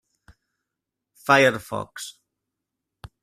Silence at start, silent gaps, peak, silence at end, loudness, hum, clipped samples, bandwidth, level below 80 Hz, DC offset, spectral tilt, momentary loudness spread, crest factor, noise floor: 1.25 s; none; -2 dBFS; 1.1 s; -20 LUFS; none; under 0.1%; 15 kHz; -60 dBFS; under 0.1%; -4 dB/octave; 19 LU; 24 dB; -85 dBFS